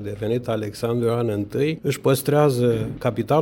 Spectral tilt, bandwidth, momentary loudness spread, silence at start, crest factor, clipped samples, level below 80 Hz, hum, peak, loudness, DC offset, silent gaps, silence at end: -6.5 dB/octave; 17 kHz; 7 LU; 0 s; 16 dB; under 0.1%; -50 dBFS; none; -4 dBFS; -22 LUFS; under 0.1%; none; 0 s